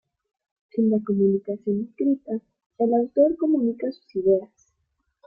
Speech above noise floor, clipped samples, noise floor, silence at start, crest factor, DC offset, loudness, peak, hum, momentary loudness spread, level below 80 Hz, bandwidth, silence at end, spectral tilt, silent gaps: 52 dB; under 0.1%; -75 dBFS; 0.75 s; 16 dB; under 0.1%; -24 LUFS; -8 dBFS; none; 10 LU; -66 dBFS; 5.4 kHz; 0.8 s; -11 dB/octave; 2.66-2.70 s